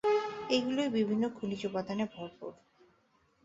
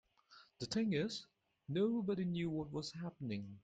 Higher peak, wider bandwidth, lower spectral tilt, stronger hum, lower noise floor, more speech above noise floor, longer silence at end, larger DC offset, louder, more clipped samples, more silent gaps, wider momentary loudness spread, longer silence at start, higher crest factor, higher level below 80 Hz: first, -16 dBFS vs -26 dBFS; second, 7.8 kHz vs 9.2 kHz; about the same, -5.5 dB/octave vs -6 dB/octave; neither; first, -71 dBFS vs -66 dBFS; first, 37 dB vs 27 dB; first, 0.9 s vs 0.05 s; neither; first, -33 LUFS vs -40 LUFS; neither; neither; first, 14 LU vs 10 LU; second, 0.05 s vs 0.3 s; about the same, 18 dB vs 16 dB; about the same, -72 dBFS vs -72 dBFS